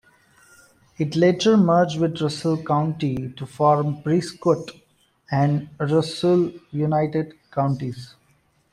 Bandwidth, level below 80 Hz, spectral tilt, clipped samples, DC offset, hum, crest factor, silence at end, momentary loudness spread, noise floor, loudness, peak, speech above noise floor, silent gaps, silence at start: 11.5 kHz; -58 dBFS; -7 dB/octave; under 0.1%; under 0.1%; none; 16 dB; 0.65 s; 11 LU; -62 dBFS; -22 LUFS; -6 dBFS; 41 dB; none; 1 s